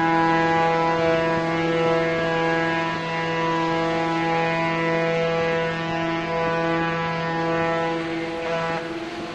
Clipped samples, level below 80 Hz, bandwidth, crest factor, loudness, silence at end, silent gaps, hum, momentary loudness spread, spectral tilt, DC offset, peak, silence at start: under 0.1%; -52 dBFS; 8.8 kHz; 14 dB; -22 LUFS; 0 s; none; none; 6 LU; -6 dB/octave; under 0.1%; -8 dBFS; 0 s